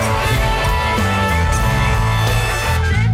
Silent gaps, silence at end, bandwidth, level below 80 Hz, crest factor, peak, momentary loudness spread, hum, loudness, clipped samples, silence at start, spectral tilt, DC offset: none; 0 s; 16.5 kHz; -22 dBFS; 12 dB; -4 dBFS; 1 LU; none; -16 LUFS; under 0.1%; 0 s; -5 dB/octave; under 0.1%